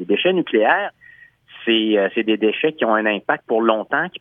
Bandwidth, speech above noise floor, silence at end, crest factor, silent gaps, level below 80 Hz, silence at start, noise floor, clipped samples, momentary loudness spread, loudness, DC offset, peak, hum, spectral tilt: 3.8 kHz; 29 dB; 0.05 s; 18 dB; none; -72 dBFS; 0 s; -47 dBFS; under 0.1%; 5 LU; -18 LUFS; under 0.1%; -2 dBFS; none; -8 dB/octave